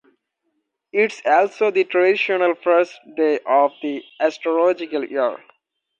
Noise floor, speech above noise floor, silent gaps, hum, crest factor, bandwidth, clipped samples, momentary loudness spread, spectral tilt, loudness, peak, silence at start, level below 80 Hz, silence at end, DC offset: -73 dBFS; 54 dB; none; none; 16 dB; 8.6 kHz; under 0.1%; 8 LU; -4.5 dB/octave; -19 LUFS; -4 dBFS; 0.95 s; -78 dBFS; 0.65 s; under 0.1%